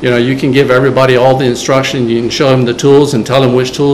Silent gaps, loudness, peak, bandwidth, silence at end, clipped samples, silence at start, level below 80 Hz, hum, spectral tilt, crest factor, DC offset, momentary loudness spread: none; -9 LUFS; 0 dBFS; 13.5 kHz; 0 s; 2%; 0 s; -40 dBFS; none; -5.5 dB/octave; 8 dB; 0.6%; 4 LU